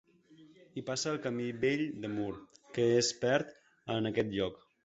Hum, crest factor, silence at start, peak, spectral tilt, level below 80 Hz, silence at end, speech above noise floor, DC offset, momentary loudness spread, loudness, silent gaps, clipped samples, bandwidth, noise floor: none; 20 dB; 0.3 s; -14 dBFS; -4.5 dB/octave; -66 dBFS; 0.3 s; 27 dB; under 0.1%; 14 LU; -33 LUFS; none; under 0.1%; 8.2 kHz; -60 dBFS